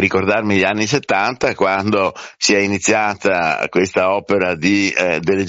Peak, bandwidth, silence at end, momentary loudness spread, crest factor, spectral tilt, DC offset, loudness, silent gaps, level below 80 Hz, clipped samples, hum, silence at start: 0 dBFS; 8 kHz; 0 s; 3 LU; 16 dB; -3.5 dB/octave; under 0.1%; -16 LUFS; none; -52 dBFS; under 0.1%; none; 0 s